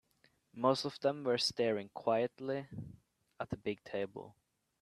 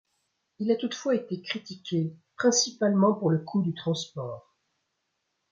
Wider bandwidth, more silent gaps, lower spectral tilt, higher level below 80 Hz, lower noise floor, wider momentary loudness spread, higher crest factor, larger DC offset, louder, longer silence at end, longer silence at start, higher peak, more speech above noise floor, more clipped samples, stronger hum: first, 13.5 kHz vs 7.6 kHz; neither; about the same, -5 dB/octave vs -4.5 dB/octave; about the same, -72 dBFS vs -74 dBFS; second, -73 dBFS vs -79 dBFS; first, 17 LU vs 12 LU; about the same, 22 dB vs 18 dB; neither; second, -36 LUFS vs -27 LUFS; second, 0.5 s vs 1.1 s; about the same, 0.55 s vs 0.6 s; second, -16 dBFS vs -12 dBFS; second, 37 dB vs 52 dB; neither; neither